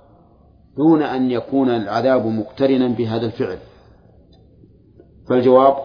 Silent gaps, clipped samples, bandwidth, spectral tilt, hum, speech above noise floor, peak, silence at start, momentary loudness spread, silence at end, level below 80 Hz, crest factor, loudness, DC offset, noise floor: none; under 0.1%; 5.2 kHz; -9 dB/octave; none; 34 dB; 0 dBFS; 0.75 s; 11 LU; 0 s; -54 dBFS; 18 dB; -18 LUFS; under 0.1%; -50 dBFS